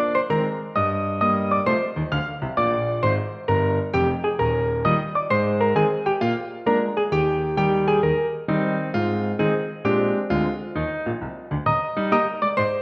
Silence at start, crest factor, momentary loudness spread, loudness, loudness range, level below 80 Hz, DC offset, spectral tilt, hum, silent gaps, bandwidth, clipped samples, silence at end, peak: 0 s; 16 dB; 5 LU; -22 LUFS; 2 LU; -44 dBFS; under 0.1%; -9 dB/octave; none; none; 6.2 kHz; under 0.1%; 0 s; -6 dBFS